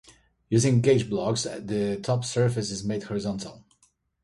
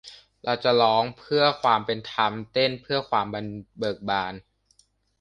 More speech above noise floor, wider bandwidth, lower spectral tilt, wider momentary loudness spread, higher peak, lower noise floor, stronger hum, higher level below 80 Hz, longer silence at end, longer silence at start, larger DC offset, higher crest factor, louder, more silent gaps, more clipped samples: about the same, 42 dB vs 39 dB; first, 11.5 kHz vs 10 kHz; about the same, -5.5 dB/octave vs -5.5 dB/octave; second, 10 LU vs 13 LU; about the same, -8 dBFS vs -6 dBFS; about the same, -67 dBFS vs -64 dBFS; neither; first, -56 dBFS vs -62 dBFS; second, 0.65 s vs 0.8 s; first, 0.5 s vs 0.05 s; neither; about the same, 18 dB vs 20 dB; about the same, -26 LUFS vs -24 LUFS; neither; neither